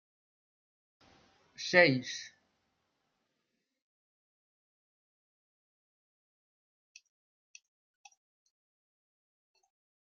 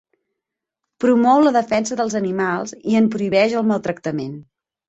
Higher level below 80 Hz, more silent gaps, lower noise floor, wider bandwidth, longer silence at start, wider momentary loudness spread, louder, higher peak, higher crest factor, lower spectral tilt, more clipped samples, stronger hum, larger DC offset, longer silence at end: second, -86 dBFS vs -62 dBFS; neither; about the same, -84 dBFS vs -83 dBFS; second, 7.2 kHz vs 8.2 kHz; first, 1.6 s vs 1 s; first, 19 LU vs 11 LU; second, -28 LUFS vs -18 LUFS; second, -8 dBFS vs -2 dBFS; first, 32 dB vs 16 dB; second, -3 dB/octave vs -5.5 dB/octave; neither; neither; neither; first, 7.8 s vs 0.45 s